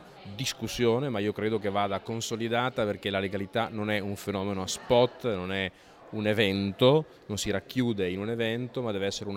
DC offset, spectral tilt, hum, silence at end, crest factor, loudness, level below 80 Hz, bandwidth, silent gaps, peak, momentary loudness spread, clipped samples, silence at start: under 0.1%; -5 dB/octave; none; 0 s; 20 dB; -29 LUFS; -58 dBFS; 16 kHz; none; -10 dBFS; 8 LU; under 0.1%; 0 s